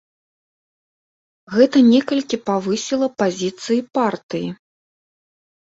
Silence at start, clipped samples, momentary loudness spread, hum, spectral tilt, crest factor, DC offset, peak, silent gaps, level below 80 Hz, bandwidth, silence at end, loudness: 1.5 s; under 0.1%; 13 LU; none; -5 dB/octave; 18 dB; under 0.1%; -2 dBFS; 4.23-4.29 s; -64 dBFS; 7.8 kHz; 1.05 s; -18 LUFS